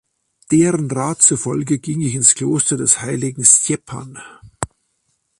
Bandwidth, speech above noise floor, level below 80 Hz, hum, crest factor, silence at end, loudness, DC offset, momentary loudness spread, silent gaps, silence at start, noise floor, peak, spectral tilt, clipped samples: 12.5 kHz; 51 dB; -52 dBFS; none; 18 dB; 0.75 s; -15 LUFS; under 0.1%; 18 LU; none; 0.5 s; -67 dBFS; 0 dBFS; -4 dB/octave; under 0.1%